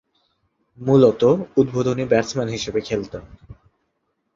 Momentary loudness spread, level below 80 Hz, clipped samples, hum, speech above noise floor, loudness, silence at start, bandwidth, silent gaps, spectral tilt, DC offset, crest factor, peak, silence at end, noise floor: 13 LU; -50 dBFS; under 0.1%; none; 54 dB; -19 LUFS; 0.8 s; 7.6 kHz; none; -6.5 dB/octave; under 0.1%; 18 dB; -2 dBFS; 0.8 s; -72 dBFS